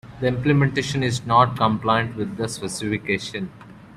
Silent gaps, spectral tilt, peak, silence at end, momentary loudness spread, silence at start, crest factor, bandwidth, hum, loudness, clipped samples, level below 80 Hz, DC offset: none; -5.5 dB/octave; -4 dBFS; 0 s; 10 LU; 0.05 s; 18 dB; 13.5 kHz; none; -22 LUFS; under 0.1%; -50 dBFS; under 0.1%